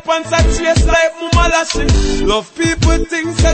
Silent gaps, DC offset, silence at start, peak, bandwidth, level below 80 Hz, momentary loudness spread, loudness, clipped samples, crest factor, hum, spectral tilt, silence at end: none; under 0.1%; 0.05 s; 0 dBFS; 8.8 kHz; -18 dBFS; 4 LU; -14 LUFS; under 0.1%; 12 dB; none; -4.5 dB/octave; 0 s